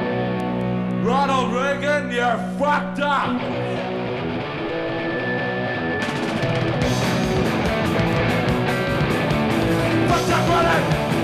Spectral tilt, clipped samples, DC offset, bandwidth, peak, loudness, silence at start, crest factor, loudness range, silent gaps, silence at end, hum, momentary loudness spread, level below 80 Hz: -6 dB/octave; under 0.1%; under 0.1%; 15 kHz; -10 dBFS; -21 LUFS; 0 s; 10 dB; 4 LU; none; 0 s; none; 6 LU; -40 dBFS